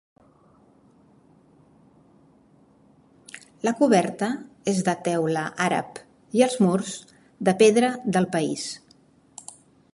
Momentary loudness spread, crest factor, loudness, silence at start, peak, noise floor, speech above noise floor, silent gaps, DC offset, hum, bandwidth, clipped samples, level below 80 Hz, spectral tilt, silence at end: 24 LU; 20 dB; -23 LUFS; 3.35 s; -6 dBFS; -57 dBFS; 35 dB; none; under 0.1%; none; 11.5 kHz; under 0.1%; -68 dBFS; -5 dB/octave; 1.15 s